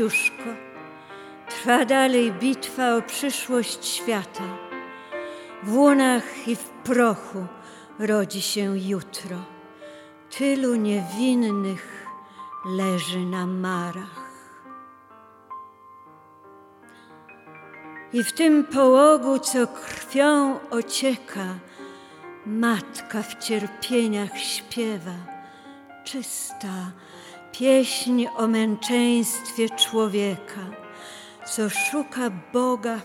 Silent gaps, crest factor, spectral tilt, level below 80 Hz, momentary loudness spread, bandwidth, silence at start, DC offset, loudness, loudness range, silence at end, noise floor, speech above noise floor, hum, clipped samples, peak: none; 20 dB; -4 dB/octave; -74 dBFS; 22 LU; 17.5 kHz; 0 s; under 0.1%; -23 LUFS; 9 LU; 0 s; -50 dBFS; 27 dB; none; under 0.1%; -4 dBFS